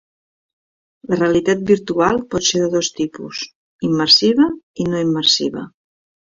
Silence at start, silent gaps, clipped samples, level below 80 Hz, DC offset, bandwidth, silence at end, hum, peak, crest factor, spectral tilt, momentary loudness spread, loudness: 1.1 s; 3.55-3.79 s, 4.63-4.74 s; under 0.1%; -52 dBFS; under 0.1%; 7.6 kHz; 0.6 s; none; 0 dBFS; 18 dB; -4 dB/octave; 16 LU; -16 LUFS